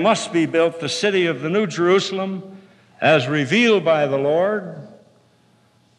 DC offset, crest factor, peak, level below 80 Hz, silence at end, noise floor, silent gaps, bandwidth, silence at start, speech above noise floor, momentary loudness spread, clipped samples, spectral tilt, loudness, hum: under 0.1%; 16 dB; -4 dBFS; -82 dBFS; 1.1 s; -57 dBFS; none; 11.5 kHz; 0 s; 39 dB; 11 LU; under 0.1%; -5 dB/octave; -18 LUFS; none